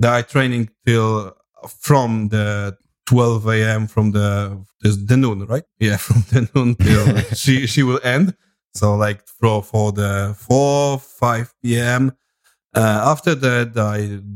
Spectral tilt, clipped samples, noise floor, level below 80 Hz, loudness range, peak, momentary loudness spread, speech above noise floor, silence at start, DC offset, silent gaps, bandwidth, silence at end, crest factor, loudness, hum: -6 dB/octave; under 0.1%; -63 dBFS; -44 dBFS; 2 LU; 0 dBFS; 7 LU; 46 dB; 0 s; under 0.1%; 1.49-1.53 s; 16.5 kHz; 0 s; 16 dB; -17 LUFS; none